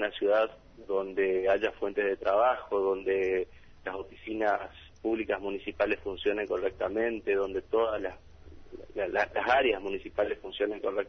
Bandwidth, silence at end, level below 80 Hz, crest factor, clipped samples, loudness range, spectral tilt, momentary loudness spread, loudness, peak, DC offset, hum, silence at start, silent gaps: 6.4 kHz; 0 s; -56 dBFS; 18 dB; under 0.1%; 3 LU; -6 dB/octave; 13 LU; -30 LUFS; -12 dBFS; under 0.1%; none; 0 s; none